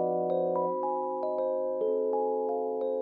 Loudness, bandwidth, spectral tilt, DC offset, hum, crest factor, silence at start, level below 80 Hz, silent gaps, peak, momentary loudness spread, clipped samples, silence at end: -30 LUFS; 4.3 kHz; -11 dB/octave; under 0.1%; none; 12 dB; 0 s; -82 dBFS; none; -18 dBFS; 3 LU; under 0.1%; 0 s